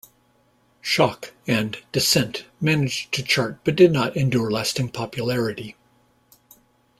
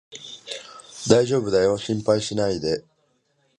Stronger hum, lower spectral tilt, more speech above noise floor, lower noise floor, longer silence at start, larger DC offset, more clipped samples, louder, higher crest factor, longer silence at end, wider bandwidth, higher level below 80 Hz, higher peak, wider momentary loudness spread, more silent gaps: neither; about the same, -4.5 dB/octave vs -5 dB/octave; second, 40 dB vs 46 dB; second, -62 dBFS vs -67 dBFS; first, 0.85 s vs 0.1 s; neither; neither; about the same, -21 LUFS vs -22 LUFS; about the same, 20 dB vs 22 dB; first, 1.3 s vs 0.8 s; first, 16 kHz vs 11.5 kHz; about the same, -56 dBFS vs -54 dBFS; about the same, -2 dBFS vs 0 dBFS; second, 11 LU vs 17 LU; neither